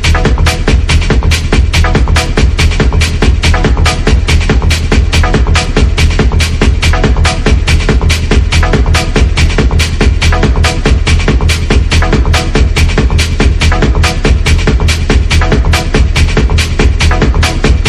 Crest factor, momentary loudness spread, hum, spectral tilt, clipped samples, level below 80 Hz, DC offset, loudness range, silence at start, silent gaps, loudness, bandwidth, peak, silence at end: 8 dB; 1 LU; none; -5 dB/octave; 0.3%; -10 dBFS; under 0.1%; 0 LU; 0 s; none; -9 LUFS; 13 kHz; 0 dBFS; 0 s